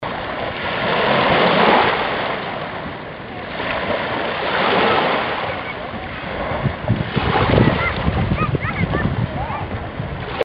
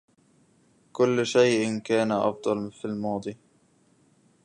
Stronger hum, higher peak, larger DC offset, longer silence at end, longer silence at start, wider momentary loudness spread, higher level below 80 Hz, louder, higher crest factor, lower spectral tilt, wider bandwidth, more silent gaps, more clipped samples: neither; first, 0 dBFS vs -8 dBFS; neither; second, 0 s vs 1.1 s; second, 0 s vs 0.95 s; about the same, 13 LU vs 12 LU; first, -34 dBFS vs -70 dBFS; first, -19 LUFS vs -25 LUFS; about the same, 20 dB vs 20 dB; first, -8.5 dB/octave vs -5 dB/octave; second, 5.6 kHz vs 11 kHz; neither; neither